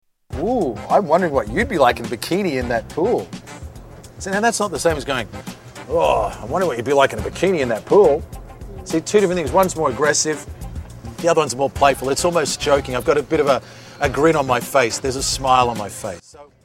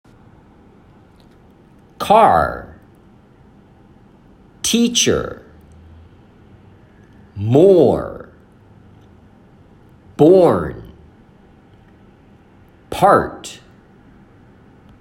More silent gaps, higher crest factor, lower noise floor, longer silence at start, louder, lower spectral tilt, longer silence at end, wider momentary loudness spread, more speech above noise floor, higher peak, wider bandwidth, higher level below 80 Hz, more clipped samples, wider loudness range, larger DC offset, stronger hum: neither; about the same, 18 dB vs 20 dB; second, -39 dBFS vs -48 dBFS; second, 0.3 s vs 2 s; second, -18 LUFS vs -14 LUFS; about the same, -4 dB/octave vs -4.5 dB/octave; second, 0.2 s vs 1.45 s; second, 17 LU vs 24 LU; second, 20 dB vs 35 dB; about the same, 0 dBFS vs 0 dBFS; about the same, 16.5 kHz vs 16 kHz; first, -38 dBFS vs -48 dBFS; neither; about the same, 4 LU vs 4 LU; neither; neither